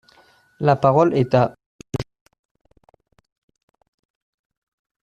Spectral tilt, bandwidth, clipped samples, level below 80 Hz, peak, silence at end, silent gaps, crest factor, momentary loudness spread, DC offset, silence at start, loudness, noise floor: -8 dB/octave; 9 kHz; under 0.1%; -54 dBFS; -2 dBFS; 3.05 s; 1.66-1.79 s; 20 dB; 15 LU; under 0.1%; 0.6 s; -19 LUFS; -55 dBFS